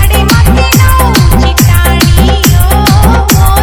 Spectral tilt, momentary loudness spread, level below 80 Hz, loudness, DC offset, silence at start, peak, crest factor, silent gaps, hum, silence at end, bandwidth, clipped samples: -5 dB/octave; 1 LU; -10 dBFS; -6 LUFS; under 0.1%; 0 s; 0 dBFS; 4 dB; none; none; 0 s; over 20 kHz; 9%